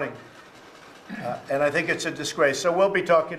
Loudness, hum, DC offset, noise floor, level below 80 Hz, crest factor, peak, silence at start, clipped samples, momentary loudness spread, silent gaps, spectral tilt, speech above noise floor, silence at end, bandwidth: -24 LUFS; none; under 0.1%; -47 dBFS; -64 dBFS; 18 dB; -6 dBFS; 0 s; under 0.1%; 13 LU; none; -4 dB/octave; 24 dB; 0 s; 14 kHz